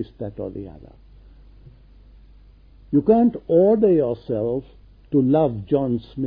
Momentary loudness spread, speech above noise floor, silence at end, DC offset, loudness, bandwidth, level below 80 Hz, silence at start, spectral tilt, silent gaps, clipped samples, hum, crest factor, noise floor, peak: 16 LU; 28 dB; 0 s; under 0.1%; -20 LUFS; 5 kHz; -48 dBFS; 0 s; -12.5 dB/octave; none; under 0.1%; none; 18 dB; -48 dBFS; -4 dBFS